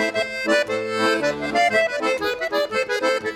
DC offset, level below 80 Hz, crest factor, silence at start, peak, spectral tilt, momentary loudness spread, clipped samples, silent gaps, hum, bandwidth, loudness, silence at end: under 0.1%; -58 dBFS; 14 dB; 0 s; -8 dBFS; -3 dB/octave; 5 LU; under 0.1%; none; none; 17 kHz; -21 LUFS; 0 s